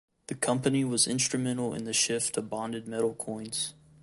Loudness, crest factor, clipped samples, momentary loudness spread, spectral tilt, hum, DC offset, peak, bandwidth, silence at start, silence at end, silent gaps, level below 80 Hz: -29 LUFS; 20 dB; under 0.1%; 10 LU; -3.5 dB/octave; none; under 0.1%; -10 dBFS; 12 kHz; 0.3 s; 0.3 s; none; -66 dBFS